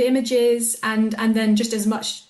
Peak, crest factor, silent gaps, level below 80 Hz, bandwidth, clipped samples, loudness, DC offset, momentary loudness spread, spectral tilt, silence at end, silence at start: -10 dBFS; 10 dB; none; -62 dBFS; 12.5 kHz; under 0.1%; -20 LUFS; under 0.1%; 4 LU; -4 dB/octave; 0.1 s; 0 s